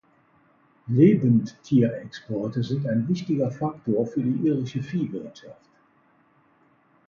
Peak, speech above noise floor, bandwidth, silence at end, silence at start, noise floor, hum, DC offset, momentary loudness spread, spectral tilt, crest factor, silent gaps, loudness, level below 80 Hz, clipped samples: -6 dBFS; 38 dB; 7.2 kHz; 1.55 s; 0.85 s; -62 dBFS; none; under 0.1%; 14 LU; -9 dB/octave; 20 dB; none; -24 LUFS; -62 dBFS; under 0.1%